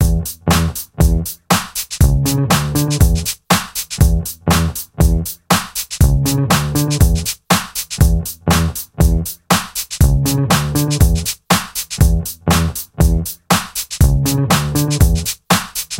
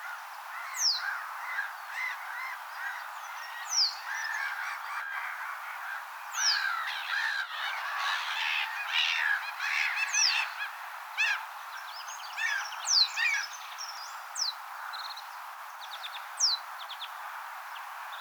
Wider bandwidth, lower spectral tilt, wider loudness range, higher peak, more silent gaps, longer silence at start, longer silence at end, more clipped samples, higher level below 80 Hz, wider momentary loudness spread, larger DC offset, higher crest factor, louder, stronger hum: second, 17 kHz vs over 20 kHz; first, -4.5 dB/octave vs 10.5 dB/octave; second, 1 LU vs 5 LU; first, 0 dBFS vs -14 dBFS; neither; about the same, 0 s vs 0 s; about the same, 0 s vs 0 s; neither; first, -20 dBFS vs under -90 dBFS; second, 5 LU vs 14 LU; neither; second, 14 dB vs 20 dB; first, -16 LUFS vs -31 LUFS; neither